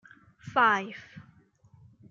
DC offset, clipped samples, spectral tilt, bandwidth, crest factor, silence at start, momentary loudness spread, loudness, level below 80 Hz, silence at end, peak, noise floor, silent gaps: under 0.1%; under 0.1%; -4.5 dB/octave; 7.4 kHz; 20 dB; 0.45 s; 25 LU; -26 LUFS; -72 dBFS; 0.9 s; -12 dBFS; -60 dBFS; none